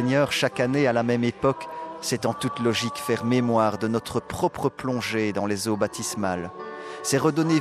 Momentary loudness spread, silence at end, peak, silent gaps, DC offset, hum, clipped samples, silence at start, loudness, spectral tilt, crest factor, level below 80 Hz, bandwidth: 9 LU; 0 s; -8 dBFS; none; under 0.1%; none; under 0.1%; 0 s; -25 LUFS; -5 dB/octave; 16 dB; -58 dBFS; 14.5 kHz